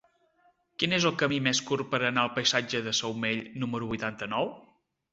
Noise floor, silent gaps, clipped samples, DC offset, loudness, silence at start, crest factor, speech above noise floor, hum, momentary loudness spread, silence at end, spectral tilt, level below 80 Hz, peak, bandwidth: -67 dBFS; none; under 0.1%; under 0.1%; -28 LUFS; 0.8 s; 22 dB; 38 dB; none; 8 LU; 0.5 s; -3.5 dB/octave; -64 dBFS; -8 dBFS; 8.2 kHz